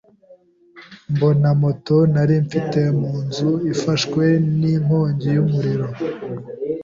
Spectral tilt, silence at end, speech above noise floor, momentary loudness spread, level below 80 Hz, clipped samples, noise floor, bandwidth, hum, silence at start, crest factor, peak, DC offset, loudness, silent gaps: -7.5 dB/octave; 0 s; 33 dB; 10 LU; -52 dBFS; under 0.1%; -50 dBFS; 7.6 kHz; none; 0.3 s; 14 dB; -4 dBFS; under 0.1%; -19 LUFS; none